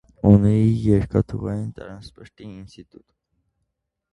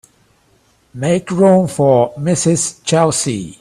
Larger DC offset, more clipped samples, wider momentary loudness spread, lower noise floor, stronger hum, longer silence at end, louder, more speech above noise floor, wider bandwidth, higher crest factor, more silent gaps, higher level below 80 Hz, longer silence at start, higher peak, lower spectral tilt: neither; neither; first, 25 LU vs 6 LU; first, -77 dBFS vs -55 dBFS; neither; first, 1.3 s vs 0.1 s; second, -19 LUFS vs -14 LUFS; first, 57 dB vs 41 dB; second, 9.4 kHz vs 14 kHz; first, 22 dB vs 16 dB; neither; first, -40 dBFS vs -50 dBFS; second, 0.25 s vs 0.95 s; about the same, 0 dBFS vs 0 dBFS; first, -10 dB/octave vs -5 dB/octave